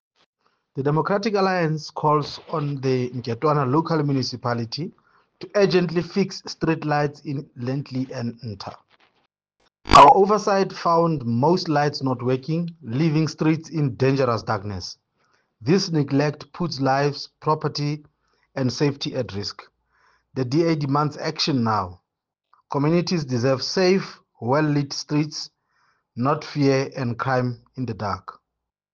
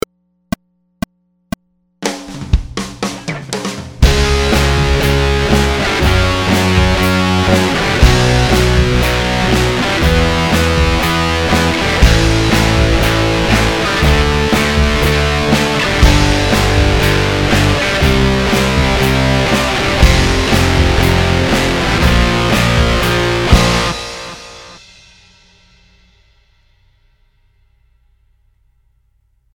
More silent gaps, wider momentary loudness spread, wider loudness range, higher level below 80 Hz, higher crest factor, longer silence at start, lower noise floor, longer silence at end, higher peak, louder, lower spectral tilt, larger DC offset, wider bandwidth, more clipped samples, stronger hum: neither; about the same, 12 LU vs 11 LU; about the same, 7 LU vs 6 LU; second, -48 dBFS vs -18 dBFS; first, 22 dB vs 12 dB; second, 0.75 s vs 2 s; first, -83 dBFS vs -57 dBFS; second, 0.6 s vs 4.8 s; about the same, -2 dBFS vs 0 dBFS; second, -22 LUFS vs -12 LUFS; about the same, -6 dB/octave vs -5 dB/octave; neither; second, 9 kHz vs 19.5 kHz; neither; neither